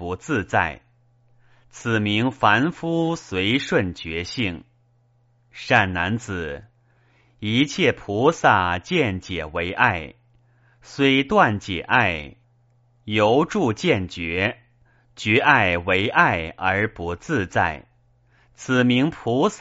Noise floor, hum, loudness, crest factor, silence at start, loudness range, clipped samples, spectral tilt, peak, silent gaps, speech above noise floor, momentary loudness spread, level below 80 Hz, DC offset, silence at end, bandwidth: -61 dBFS; none; -21 LUFS; 22 dB; 0 s; 4 LU; under 0.1%; -3.5 dB/octave; 0 dBFS; none; 40 dB; 12 LU; -50 dBFS; under 0.1%; 0 s; 8 kHz